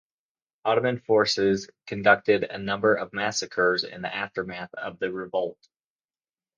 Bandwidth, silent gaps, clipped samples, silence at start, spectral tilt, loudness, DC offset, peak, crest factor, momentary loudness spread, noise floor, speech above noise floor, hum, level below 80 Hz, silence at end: 9.6 kHz; none; under 0.1%; 0.65 s; -4 dB/octave; -25 LUFS; under 0.1%; -4 dBFS; 22 dB; 12 LU; under -90 dBFS; over 65 dB; none; -64 dBFS; 1.05 s